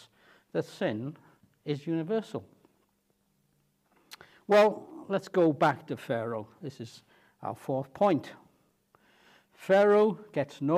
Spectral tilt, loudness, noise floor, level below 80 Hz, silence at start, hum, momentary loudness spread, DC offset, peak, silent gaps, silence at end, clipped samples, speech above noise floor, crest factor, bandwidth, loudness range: -7 dB/octave; -29 LUFS; -73 dBFS; -78 dBFS; 0.55 s; none; 19 LU; under 0.1%; -10 dBFS; none; 0 s; under 0.1%; 45 dB; 20 dB; 14.5 kHz; 8 LU